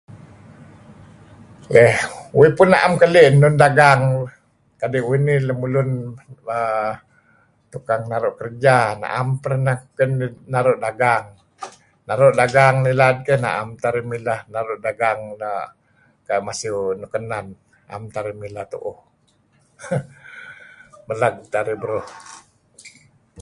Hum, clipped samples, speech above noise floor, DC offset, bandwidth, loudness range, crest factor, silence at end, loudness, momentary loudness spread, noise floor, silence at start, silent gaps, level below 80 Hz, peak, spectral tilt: none; under 0.1%; 43 dB; under 0.1%; 11.5 kHz; 14 LU; 20 dB; 0 s; -18 LUFS; 22 LU; -60 dBFS; 0.1 s; none; -56 dBFS; 0 dBFS; -6 dB/octave